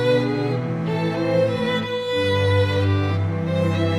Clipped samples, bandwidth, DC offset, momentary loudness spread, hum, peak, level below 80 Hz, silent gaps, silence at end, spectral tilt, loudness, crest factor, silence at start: under 0.1%; 10.5 kHz; under 0.1%; 5 LU; none; -8 dBFS; -54 dBFS; none; 0 s; -7 dB/octave; -21 LUFS; 12 dB; 0 s